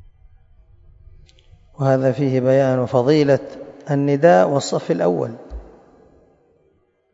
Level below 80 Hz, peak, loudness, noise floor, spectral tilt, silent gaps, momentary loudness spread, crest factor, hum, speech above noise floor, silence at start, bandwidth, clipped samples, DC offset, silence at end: -48 dBFS; -2 dBFS; -17 LUFS; -62 dBFS; -7 dB/octave; none; 22 LU; 18 dB; none; 45 dB; 1.8 s; 8 kHz; under 0.1%; under 0.1%; 1.5 s